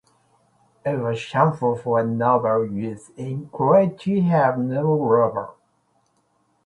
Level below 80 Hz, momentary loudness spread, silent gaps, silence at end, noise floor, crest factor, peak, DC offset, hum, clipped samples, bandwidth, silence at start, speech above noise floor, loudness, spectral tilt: -62 dBFS; 13 LU; none; 1.15 s; -66 dBFS; 18 dB; -4 dBFS; under 0.1%; none; under 0.1%; 11 kHz; 0.85 s; 45 dB; -21 LUFS; -8.5 dB/octave